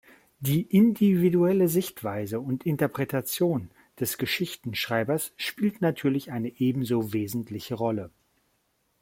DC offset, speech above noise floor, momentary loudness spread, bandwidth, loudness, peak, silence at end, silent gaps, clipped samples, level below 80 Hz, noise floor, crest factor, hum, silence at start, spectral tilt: under 0.1%; 46 dB; 11 LU; 16.5 kHz; -27 LUFS; -10 dBFS; 0.95 s; none; under 0.1%; -64 dBFS; -72 dBFS; 18 dB; none; 0.4 s; -6 dB/octave